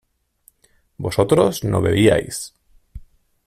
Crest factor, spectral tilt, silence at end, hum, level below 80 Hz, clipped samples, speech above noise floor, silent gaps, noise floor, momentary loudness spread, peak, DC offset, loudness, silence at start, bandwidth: 18 dB; -5.5 dB/octave; 0.45 s; none; -44 dBFS; under 0.1%; 43 dB; none; -60 dBFS; 14 LU; -2 dBFS; under 0.1%; -18 LUFS; 1 s; 15.5 kHz